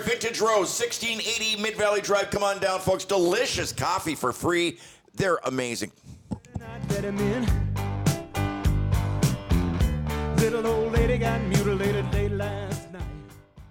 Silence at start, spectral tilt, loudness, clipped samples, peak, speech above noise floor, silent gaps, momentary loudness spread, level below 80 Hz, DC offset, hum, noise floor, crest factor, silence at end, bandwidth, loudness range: 0 s; -5 dB/octave; -26 LUFS; under 0.1%; -10 dBFS; 21 dB; none; 11 LU; -36 dBFS; under 0.1%; none; -47 dBFS; 16 dB; 0.05 s; 19.5 kHz; 4 LU